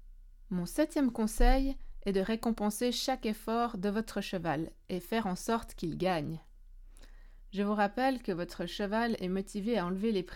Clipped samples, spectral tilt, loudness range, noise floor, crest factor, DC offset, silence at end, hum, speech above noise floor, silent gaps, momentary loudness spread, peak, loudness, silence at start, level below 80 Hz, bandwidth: under 0.1%; -5.5 dB/octave; 4 LU; -52 dBFS; 20 dB; under 0.1%; 0 s; none; 20 dB; none; 8 LU; -14 dBFS; -33 LUFS; 0 s; -40 dBFS; 18 kHz